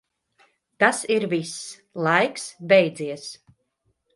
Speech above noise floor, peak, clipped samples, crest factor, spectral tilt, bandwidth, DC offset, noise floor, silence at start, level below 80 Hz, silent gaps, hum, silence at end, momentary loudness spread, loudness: 49 dB; -2 dBFS; under 0.1%; 22 dB; -4 dB/octave; 11.5 kHz; under 0.1%; -72 dBFS; 0.8 s; -72 dBFS; none; none; 0.8 s; 17 LU; -22 LUFS